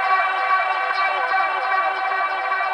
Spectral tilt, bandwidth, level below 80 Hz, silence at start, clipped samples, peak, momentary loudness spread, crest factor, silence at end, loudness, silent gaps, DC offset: -1 dB/octave; 9.4 kHz; -68 dBFS; 0 s; under 0.1%; -8 dBFS; 3 LU; 14 dB; 0 s; -20 LUFS; none; under 0.1%